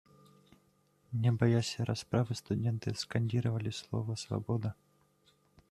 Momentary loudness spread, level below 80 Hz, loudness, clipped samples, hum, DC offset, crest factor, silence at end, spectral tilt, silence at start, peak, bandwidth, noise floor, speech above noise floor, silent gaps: 8 LU; -66 dBFS; -34 LUFS; under 0.1%; none; under 0.1%; 20 dB; 0.95 s; -6.5 dB/octave; 1.1 s; -14 dBFS; 12 kHz; -70 dBFS; 38 dB; none